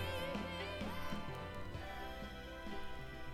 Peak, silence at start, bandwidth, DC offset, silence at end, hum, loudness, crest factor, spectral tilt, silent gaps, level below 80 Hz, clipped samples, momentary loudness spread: -28 dBFS; 0 s; 16 kHz; under 0.1%; 0 s; none; -46 LUFS; 16 dB; -5.5 dB/octave; none; -54 dBFS; under 0.1%; 7 LU